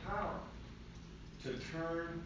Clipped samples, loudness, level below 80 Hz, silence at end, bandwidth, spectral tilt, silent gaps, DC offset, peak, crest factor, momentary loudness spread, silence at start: under 0.1%; -44 LUFS; -54 dBFS; 0 s; 7.6 kHz; -6 dB/octave; none; under 0.1%; -28 dBFS; 16 dB; 13 LU; 0 s